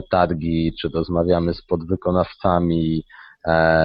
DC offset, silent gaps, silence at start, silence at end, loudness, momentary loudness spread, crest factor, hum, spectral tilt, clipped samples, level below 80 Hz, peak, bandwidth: under 0.1%; none; 0 s; 0 s; -21 LUFS; 6 LU; 18 dB; none; -11 dB/octave; under 0.1%; -40 dBFS; -2 dBFS; 5.4 kHz